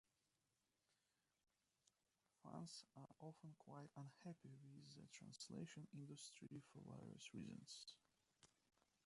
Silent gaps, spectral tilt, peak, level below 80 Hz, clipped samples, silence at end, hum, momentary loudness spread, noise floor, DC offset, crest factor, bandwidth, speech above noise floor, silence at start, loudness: none; -4.5 dB/octave; -42 dBFS; under -90 dBFS; under 0.1%; 0.55 s; none; 7 LU; under -90 dBFS; under 0.1%; 20 dB; 11.5 kHz; over 30 dB; 2.45 s; -60 LUFS